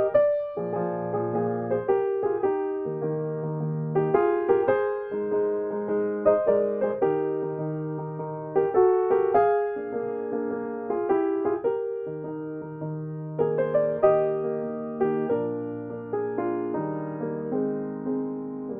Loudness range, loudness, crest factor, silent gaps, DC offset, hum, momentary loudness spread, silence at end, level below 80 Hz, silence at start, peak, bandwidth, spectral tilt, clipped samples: 4 LU; -26 LUFS; 18 dB; none; under 0.1%; none; 11 LU; 0 s; -66 dBFS; 0 s; -8 dBFS; 3.5 kHz; -8.5 dB/octave; under 0.1%